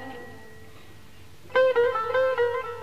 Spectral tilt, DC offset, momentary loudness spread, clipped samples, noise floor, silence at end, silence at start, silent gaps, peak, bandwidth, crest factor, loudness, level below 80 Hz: -4.5 dB/octave; 0.6%; 20 LU; under 0.1%; -50 dBFS; 0 s; 0 s; none; -12 dBFS; 13 kHz; 14 dB; -24 LUFS; -60 dBFS